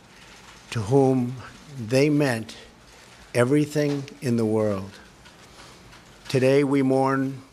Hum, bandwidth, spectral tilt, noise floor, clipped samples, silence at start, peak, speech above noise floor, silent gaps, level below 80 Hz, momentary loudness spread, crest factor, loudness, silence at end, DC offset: none; 14.5 kHz; -6.5 dB/octave; -49 dBFS; under 0.1%; 0.5 s; -6 dBFS; 27 dB; none; -60 dBFS; 19 LU; 18 dB; -23 LUFS; 0.1 s; under 0.1%